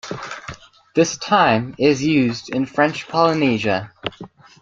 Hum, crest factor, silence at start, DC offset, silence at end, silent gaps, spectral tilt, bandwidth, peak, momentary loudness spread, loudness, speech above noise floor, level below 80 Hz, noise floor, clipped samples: none; 18 dB; 0.05 s; under 0.1%; 0.35 s; none; -5 dB/octave; 7.8 kHz; -2 dBFS; 15 LU; -18 LUFS; 23 dB; -54 dBFS; -40 dBFS; under 0.1%